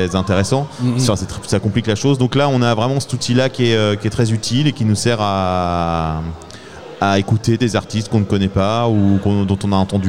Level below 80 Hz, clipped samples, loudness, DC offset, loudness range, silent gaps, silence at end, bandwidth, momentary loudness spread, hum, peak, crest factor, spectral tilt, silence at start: -40 dBFS; under 0.1%; -17 LUFS; 1%; 2 LU; none; 0 s; 14 kHz; 5 LU; none; -2 dBFS; 14 dB; -6 dB/octave; 0 s